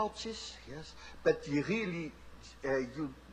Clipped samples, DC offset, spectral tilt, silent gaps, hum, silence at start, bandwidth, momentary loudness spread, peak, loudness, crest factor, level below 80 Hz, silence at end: under 0.1%; under 0.1%; -5.5 dB/octave; none; none; 0 s; 10.5 kHz; 15 LU; -16 dBFS; -36 LUFS; 20 dB; -58 dBFS; 0 s